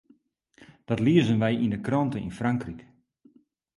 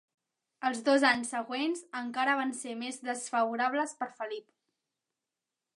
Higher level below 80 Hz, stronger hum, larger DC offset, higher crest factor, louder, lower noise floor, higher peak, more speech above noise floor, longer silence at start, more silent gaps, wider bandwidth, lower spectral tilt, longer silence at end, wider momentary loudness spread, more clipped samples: first, -56 dBFS vs -82 dBFS; neither; neither; about the same, 20 dB vs 22 dB; first, -25 LUFS vs -31 LUFS; second, -63 dBFS vs -89 dBFS; about the same, -8 dBFS vs -10 dBFS; second, 38 dB vs 58 dB; about the same, 0.6 s vs 0.6 s; neither; about the same, 11.5 kHz vs 11.5 kHz; first, -7.5 dB/octave vs -2 dB/octave; second, 0.95 s vs 1.4 s; about the same, 10 LU vs 12 LU; neither